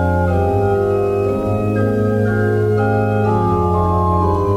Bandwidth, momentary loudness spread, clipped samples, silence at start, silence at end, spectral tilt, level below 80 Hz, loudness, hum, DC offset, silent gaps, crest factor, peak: 10.5 kHz; 2 LU; under 0.1%; 0 s; 0 s; -9.5 dB/octave; -34 dBFS; -16 LUFS; none; 0.2%; none; 10 dB; -4 dBFS